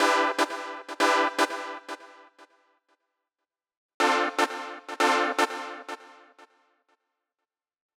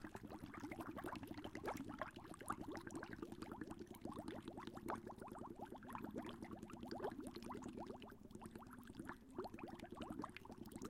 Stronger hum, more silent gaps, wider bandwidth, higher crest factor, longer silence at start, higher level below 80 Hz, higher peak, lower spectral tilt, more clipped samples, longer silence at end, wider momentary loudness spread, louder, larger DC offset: neither; first, 3.77-4.00 s vs none; first, 18 kHz vs 16 kHz; about the same, 20 dB vs 22 dB; about the same, 0 s vs 0 s; second, under -90 dBFS vs -68 dBFS; first, -8 dBFS vs -30 dBFS; second, 0 dB/octave vs -5.5 dB/octave; neither; first, 1.85 s vs 0 s; first, 17 LU vs 6 LU; first, -26 LUFS vs -53 LUFS; neither